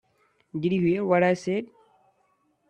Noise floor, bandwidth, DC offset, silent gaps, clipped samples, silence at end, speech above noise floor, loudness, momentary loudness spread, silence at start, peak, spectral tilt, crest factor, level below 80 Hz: -69 dBFS; 9.2 kHz; under 0.1%; none; under 0.1%; 1.05 s; 45 dB; -25 LUFS; 13 LU; 0.55 s; -8 dBFS; -7.5 dB/octave; 20 dB; -66 dBFS